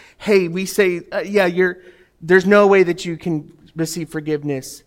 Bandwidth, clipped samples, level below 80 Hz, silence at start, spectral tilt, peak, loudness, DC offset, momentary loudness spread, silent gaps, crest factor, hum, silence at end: 16.5 kHz; under 0.1%; -56 dBFS; 0.2 s; -5.5 dB/octave; -2 dBFS; -17 LUFS; under 0.1%; 14 LU; none; 16 dB; none; 0.1 s